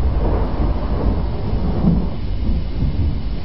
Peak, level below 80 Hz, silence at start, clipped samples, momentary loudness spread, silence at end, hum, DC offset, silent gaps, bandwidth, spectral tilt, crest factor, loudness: -2 dBFS; -20 dBFS; 0 s; under 0.1%; 5 LU; 0 s; none; 6%; none; 5.8 kHz; -11.5 dB/octave; 14 dB; -21 LUFS